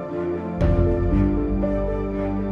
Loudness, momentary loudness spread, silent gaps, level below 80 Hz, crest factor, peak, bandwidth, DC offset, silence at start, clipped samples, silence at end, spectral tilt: -23 LUFS; 6 LU; none; -28 dBFS; 14 dB; -6 dBFS; 5.4 kHz; under 0.1%; 0 s; under 0.1%; 0 s; -10.5 dB/octave